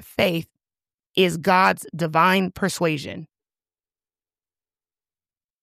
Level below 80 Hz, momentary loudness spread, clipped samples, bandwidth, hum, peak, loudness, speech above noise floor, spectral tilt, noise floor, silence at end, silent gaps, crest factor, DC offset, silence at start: -60 dBFS; 12 LU; under 0.1%; 15.5 kHz; none; -4 dBFS; -21 LUFS; over 69 dB; -5 dB/octave; under -90 dBFS; 2.35 s; 0.94-0.98 s, 1.06-1.14 s; 20 dB; under 0.1%; 0.2 s